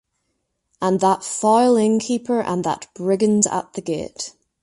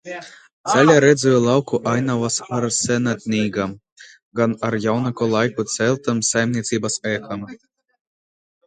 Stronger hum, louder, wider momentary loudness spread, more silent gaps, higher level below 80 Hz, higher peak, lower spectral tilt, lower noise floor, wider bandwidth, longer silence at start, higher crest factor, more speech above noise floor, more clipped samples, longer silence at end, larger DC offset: neither; about the same, -19 LUFS vs -19 LUFS; second, 11 LU vs 14 LU; second, none vs 0.53-0.64 s, 3.92-3.96 s, 4.23-4.31 s; about the same, -60 dBFS vs -58 dBFS; about the same, -2 dBFS vs 0 dBFS; about the same, -5 dB/octave vs -4.5 dB/octave; second, -73 dBFS vs under -90 dBFS; first, 11.5 kHz vs 9.6 kHz; first, 0.8 s vs 0.05 s; about the same, 18 dB vs 20 dB; second, 54 dB vs over 71 dB; neither; second, 0.3 s vs 1.1 s; neither